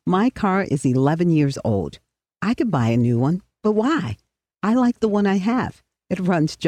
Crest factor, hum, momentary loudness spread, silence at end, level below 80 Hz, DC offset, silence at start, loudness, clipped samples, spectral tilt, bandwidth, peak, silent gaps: 14 dB; none; 8 LU; 0 s; -52 dBFS; under 0.1%; 0.05 s; -21 LUFS; under 0.1%; -7.5 dB/octave; 11 kHz; -6 dBFS; none